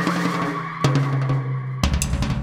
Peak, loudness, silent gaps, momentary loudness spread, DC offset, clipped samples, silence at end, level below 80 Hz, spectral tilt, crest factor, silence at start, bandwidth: -4 dBFS; -22 LUFS; none; 4 LU; under 0.1%; under 0.1%; 0 s; -30 dBFS; -5.5 dB/octave; 18 dB; 0 s; 15.5 kHz